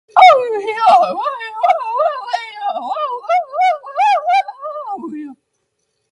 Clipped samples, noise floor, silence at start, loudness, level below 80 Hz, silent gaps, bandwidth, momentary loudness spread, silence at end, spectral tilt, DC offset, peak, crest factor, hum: under 0.1%; -69 dBFS; 0.15 s; -15 LUFS; -72 dBFS; none; 10.5 kHz; 16 LU; 0.8 s; -2.5 dB/octave; under 0.1%; 0 dBFS; 16 dB; none